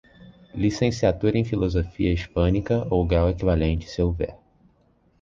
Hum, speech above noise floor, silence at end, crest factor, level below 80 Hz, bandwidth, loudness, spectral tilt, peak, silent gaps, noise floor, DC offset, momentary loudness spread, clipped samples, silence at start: none; 40 dB; 0.85 s; 18 dB; -32 dBFS; 7.4 kHz; -23 LUFS; -7.5 dB/octave; -6 dBFS; none; -62 dBFS; under 0.1%; 5 LU; under 0.1%; 0.25 s